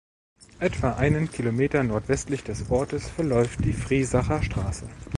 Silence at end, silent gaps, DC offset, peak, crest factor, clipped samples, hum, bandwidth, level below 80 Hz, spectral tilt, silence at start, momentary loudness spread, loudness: 0 s; none; under 0.1%; -6 dBFS; 18 dB; under 0.1%; none; 11.5 kHz; -38 dBFS; -6.5 dB/octave; 0.6 s; 7 LU; -26 LUFS